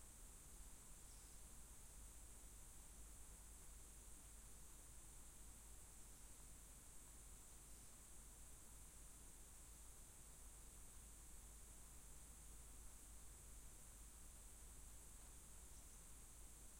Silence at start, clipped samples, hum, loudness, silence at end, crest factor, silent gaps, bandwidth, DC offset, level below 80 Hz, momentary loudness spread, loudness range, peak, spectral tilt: 0 s; under 0.1%; none; -61 LUFS; 0 s; 14 dB; none; 16.5 kHz; under 0.1%; -64 dBFS; 1 LU; 0 LU; -46 dBFS; -2.5 dB/octave